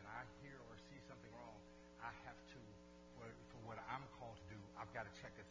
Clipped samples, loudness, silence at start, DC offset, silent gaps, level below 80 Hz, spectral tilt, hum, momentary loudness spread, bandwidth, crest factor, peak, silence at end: under 0.1%; -56 LUFS; 0 s; under 0.1%; none; -72 dBFS; -5.5 dB/octave; none; 10 LU; 8 kHz; 22 dB; -34 dBFS; 0 s